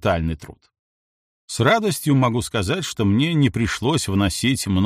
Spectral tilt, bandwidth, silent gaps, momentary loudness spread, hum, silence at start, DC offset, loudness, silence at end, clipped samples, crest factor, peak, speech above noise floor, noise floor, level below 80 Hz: -5 dB/octave; 15.5 kHz; 0.79-1.48 s; 6 LU; none; 0.05 s; under 0.1%; -20 LUFS; 0 s; under 0.1%; 16 dB; -4 dBFS; over 70 dB; under -90 dBFS; -42 dBFS